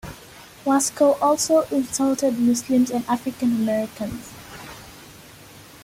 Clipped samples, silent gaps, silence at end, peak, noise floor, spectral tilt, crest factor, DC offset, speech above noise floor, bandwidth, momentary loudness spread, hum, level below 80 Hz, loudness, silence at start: under 0.1%; none; 0.05 s; -6 dBFS; -45 dBFS; -4 dB/octave; 16 dB; under 0.1%; 24 dB; 16.5 kHz; 21 LU; none; -54 dBFS; -21 LUFS; 0.05 s